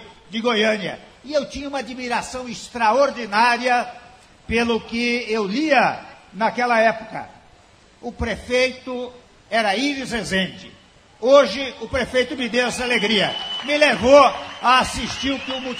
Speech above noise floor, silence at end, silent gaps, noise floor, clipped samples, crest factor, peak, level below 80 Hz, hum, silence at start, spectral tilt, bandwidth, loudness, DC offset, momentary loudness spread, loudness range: 31 dB; 0 s; none; -51 dBFS; under 0.1%; 20 dB; 0 dBFS; -46 dBFS; none; 0 s; -3.5 dB/octave; 14 kHz; -19 LUFS; under 0.1%; 15 LU; 6 LU